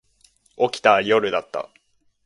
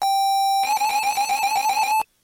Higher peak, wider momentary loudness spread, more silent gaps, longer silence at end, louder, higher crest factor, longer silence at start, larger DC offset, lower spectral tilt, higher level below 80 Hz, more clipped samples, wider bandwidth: first, 0 dBFS vs -12 dBFS; first, 15 LU vs 2 LU; neither; first, 0.65 s vs 0.2 s; about the same, -20 LUFS vs -20 LUFS; first, 22 dB vs 10 dB; first, 0.6 s vs 0 s; neither; first, -4 dB/octave vs 2 dB/octave; about the same, -64 dBFS vs -64 dBFS; neither; second, 11.5 kHz vs 17 kHz